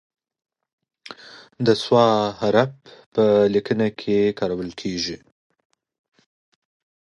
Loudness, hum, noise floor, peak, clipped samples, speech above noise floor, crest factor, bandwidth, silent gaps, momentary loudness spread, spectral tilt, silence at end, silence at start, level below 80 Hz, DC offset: -20 LUFS; none; -43 dBFS; -4 dBFS; under 0.1%; 23 dB; 20 dB; 11 kHz; 3.06-3.12 s; 21 LU; -6 dB/octave; 1.95 s; 1.1 s; -58 dBFS; under 0.1%